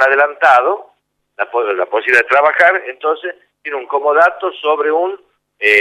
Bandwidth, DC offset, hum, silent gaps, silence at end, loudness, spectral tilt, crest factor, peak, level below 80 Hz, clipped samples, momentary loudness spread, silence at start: 13 kHz; under 0.1%; 50 Hz at -75 dBFS; none; 0 s; -13 LUFS; -2.5 dB/octave; 14 dB; 0 dBFS; -70 dBFS; under 0.1%; 14 LU; 0 s